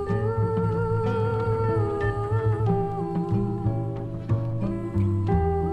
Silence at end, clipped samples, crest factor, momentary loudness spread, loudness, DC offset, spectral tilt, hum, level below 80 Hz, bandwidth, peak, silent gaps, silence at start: 0 s; under 0.1%; 12 dB; 4 LU; -26 LUFS; under 0.1%; -10 dB/octave; none; -38 dBFS; 4.9 kHz; -12 dBFS; none; 0 s